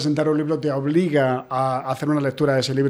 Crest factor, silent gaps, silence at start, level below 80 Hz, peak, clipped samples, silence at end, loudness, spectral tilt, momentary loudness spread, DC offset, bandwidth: 14 dB; none; 0 s; -62 dBFS; -6 dBFS; under 0.1%; 0 s; -21 LUFS; -6.5 dB/octave; 3 LU; under 0.1%; 13.5 kHz